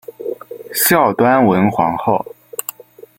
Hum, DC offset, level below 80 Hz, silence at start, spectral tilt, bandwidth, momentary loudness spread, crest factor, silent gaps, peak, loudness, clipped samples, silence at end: none; under 0.1%; -54 dBFS; 0.1 s; -4.5 dB/octave; 17 kHz; 16 LU; 16 dB; none; 0 dBFS; -15 LUFS; under 0.1%; 0.55 s